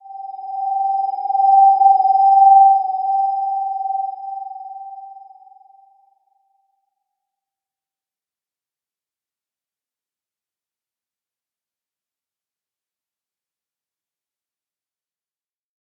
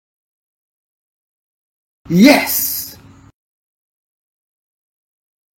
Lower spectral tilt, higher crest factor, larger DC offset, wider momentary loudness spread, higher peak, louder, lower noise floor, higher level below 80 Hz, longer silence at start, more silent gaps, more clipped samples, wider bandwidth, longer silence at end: about the same, -5 dB/octave vs -4.5 dB/octave; about the same, 18 dB vs 20 dB; neither; first, 23 LU vs 14 LU; about the same, -2 dBFS vs 0 dBFS; about the same, -15 LUFS vs -13 LUFS; first, under -90 dBFS vs -39 dBFS; second, under -90 dBFS vs -54 dBFS; second, 0.05 s vs 2.1 s; neither; neither; second, 5.2 kHz vs 16.5 kHz; first, 10.85 s vs 2.65 s